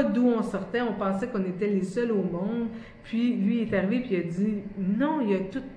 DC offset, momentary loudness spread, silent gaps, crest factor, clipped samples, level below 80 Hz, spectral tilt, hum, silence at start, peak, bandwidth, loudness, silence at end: under 0.1%; 5 LU; none; 16 dB; under 0.1%; -56 dBFS; -8 dB/octave; none; 0 s; -10 dBFS; 10 kHz; -27 LUFS; 0 s